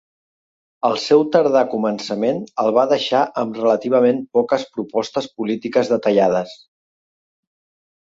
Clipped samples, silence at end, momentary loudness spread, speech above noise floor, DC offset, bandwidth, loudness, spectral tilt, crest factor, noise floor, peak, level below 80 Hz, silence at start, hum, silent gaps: under 0.1%; 1.55 s; 8 LU; over 72 dB; under 0.1%; 7.8 kHz; -18 LUFS; -5.5 dB/octave; 16 dB; under -90 dBFS; -2 dBFS; -64 dBFS; 0.85 s; none; none